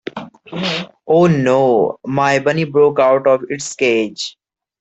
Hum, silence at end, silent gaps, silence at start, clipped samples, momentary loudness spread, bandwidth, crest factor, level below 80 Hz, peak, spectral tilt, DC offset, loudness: none; 0.5 s; none; 0.15 s; under 0.1%; 13 LU; 8.4 kHz; 14 dB; -58 dBFS; -2 dBFS; -5.5 dB/octave; under 0.1%; -15 LUFS